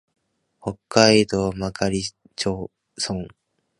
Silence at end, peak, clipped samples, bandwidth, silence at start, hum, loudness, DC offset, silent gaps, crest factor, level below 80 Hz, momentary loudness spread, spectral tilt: 0.5 s; 0 dBFS; under 0.1%; 11.5 kHz; 0.65 s; none; -22 LUFS; under 0.1%; none; 24 dB; -48 dBFS; 18 LU; -4 dB/octave